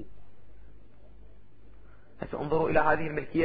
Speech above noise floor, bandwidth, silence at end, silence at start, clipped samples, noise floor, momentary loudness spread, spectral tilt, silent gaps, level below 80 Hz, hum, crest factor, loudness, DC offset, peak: 29 dB; 4.9 kHz; 0 s; 0 s; under 0.1%; -56 dBFS; 18 LU; -10.5 dB/octave; none; -52 dBFS; none; 22 dB; -28 LUFS; under 0.1%; -10 dBFS